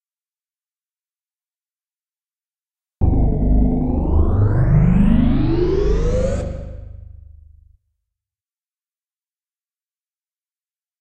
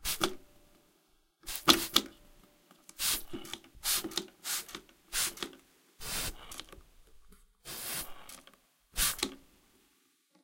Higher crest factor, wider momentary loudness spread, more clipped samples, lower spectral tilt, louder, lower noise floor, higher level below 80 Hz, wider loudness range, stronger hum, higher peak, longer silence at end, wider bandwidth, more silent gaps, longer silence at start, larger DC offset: second, 16 dB vs 34 dB; second, 11 LU vs 21 LU; neither; first, -9.5 dB/octave vs -1 dB/octave; first, -18 LUFS vs -32 LUFS; first, under -90 dBFS vs -71 dBFS; first, -24 dBFS vs -54 dBFS; first, 12 LU vs 9 LU; neither; about the same, -2 dBFS vs -4 dBFS; first, 4.1 s vs 1.05 s; second, 8.2 kHz vs 17 kHz; neither; first, 3 s vs 0 s; neither